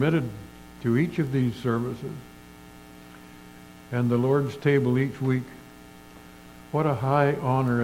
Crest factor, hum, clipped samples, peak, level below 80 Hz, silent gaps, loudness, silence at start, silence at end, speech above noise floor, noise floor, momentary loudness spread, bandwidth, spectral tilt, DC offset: 20 dB; none; under 0.1%; -6 dBFS; -56 dBFS; none; -25 LUFS; 0 s; 0 s; 23 dB; -47 dBFS; 24 LU; 16 kHz; -8 dB/octave; under 0.1%